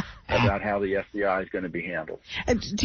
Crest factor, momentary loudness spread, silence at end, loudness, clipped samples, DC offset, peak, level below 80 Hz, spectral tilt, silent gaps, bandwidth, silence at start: 16 dB; 8 LU; 0 s; -27 LUFS; under 0.1%; under 0.1%; -10 dBFS; -44 dBFS; -4 dB/octave; none; 7 kHz; 0 s